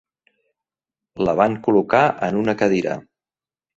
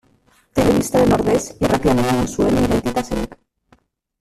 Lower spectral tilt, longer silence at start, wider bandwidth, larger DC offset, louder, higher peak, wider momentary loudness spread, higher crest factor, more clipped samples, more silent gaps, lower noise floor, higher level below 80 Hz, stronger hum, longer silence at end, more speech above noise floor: about the same, -7 dB/octave vs -6 dB/octave; first, 1.15 s vs 0.55 s; second, 7.8 kHz vs 14.5 kHz; neither; about the same, -19 LUFS vs -18 LUFS; about the same, -2 dBFS vs -2 dBFS; about the same, 7 LU vs 9 LU; about the same, 20 dB vs 16 dB; neither; neither; first, under -90 dBFS vs -57 dBFS; second, -56 dBFS vs -36 dBFS; neither; second, 0.75 s vs 0.95 s; first, over 72 dB vs 41 dB